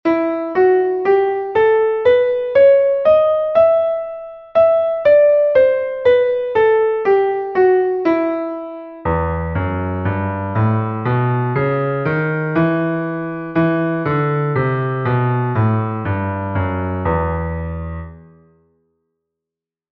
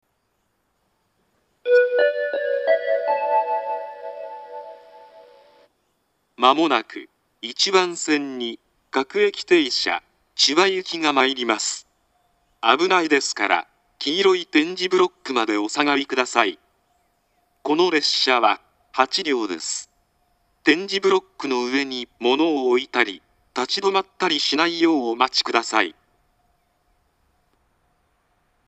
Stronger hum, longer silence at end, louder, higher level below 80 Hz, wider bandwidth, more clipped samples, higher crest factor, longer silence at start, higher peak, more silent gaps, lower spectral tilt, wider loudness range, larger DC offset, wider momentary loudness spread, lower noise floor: neither; second, 1.7 s vs 2.75 s; first, -16 LUFS vs -20 LUFS; first, -40 dBFS vs -70 dBFS; second, 5.8 kHz vs 8.8 kHz; neither; second, 14 dB vs 22 dB; second, 0.05 s vs 1.65 s; about the same, -2 dBFS vs 0 dBFS; neither; first, -10.5 dB/octave vs -2 dB/octave; about the same, 6 LU vs 5 LU; neither; second, 9 LU vs 13 LU; first, -86 dBFS vs -70 dBFS